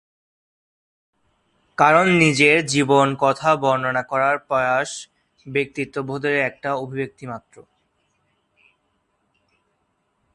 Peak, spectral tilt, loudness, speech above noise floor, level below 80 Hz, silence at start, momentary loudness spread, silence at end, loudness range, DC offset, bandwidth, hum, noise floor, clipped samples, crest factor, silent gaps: 0 dBFS; -4.5 dB/octave; -19 LUFS; 50 dB; -62 dBFS; 1.8 s; 15 LU; 2.75 s; 12 LU; under 0.1%; 11.5 kHz; none; -70 dBFS; under 0.1%; 22 dB; none